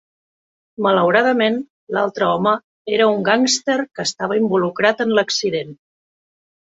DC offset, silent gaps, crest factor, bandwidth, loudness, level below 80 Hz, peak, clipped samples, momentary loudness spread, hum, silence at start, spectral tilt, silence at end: under 0.1%; 1.70-1.87 s, 2.64-2.85 s; 18 dB; 8.2 kHz; -18 LUFS; -64 dBFS; 0 dBFS; under 0.1%; 9 LU; none; 0.8 s; -3.5 dB/octave; 1 s